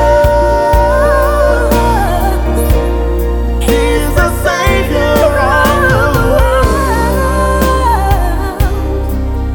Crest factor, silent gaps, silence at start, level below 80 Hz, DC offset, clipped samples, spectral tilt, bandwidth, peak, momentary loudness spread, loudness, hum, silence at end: 10 dB; none; 0 s; -14 dBFS; 0.6%; under 0.1%; -6 dB/octave; 19.5 kHz; 0 dBFS; 6 LU; -11 LUFS; none; 0 s